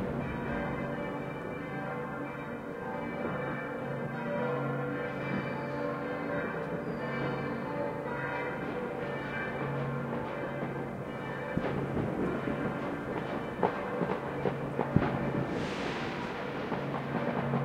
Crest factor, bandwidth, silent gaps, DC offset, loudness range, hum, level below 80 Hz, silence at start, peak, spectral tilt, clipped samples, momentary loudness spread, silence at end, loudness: 26 dB; 15 kHz; none; under 0.1%; 3 LU; none; -56 dBFS; 0 s; -8 dBFS; -7.5 dB/octave; under 0.1%; 5 LU; 0 s; -35 LUFS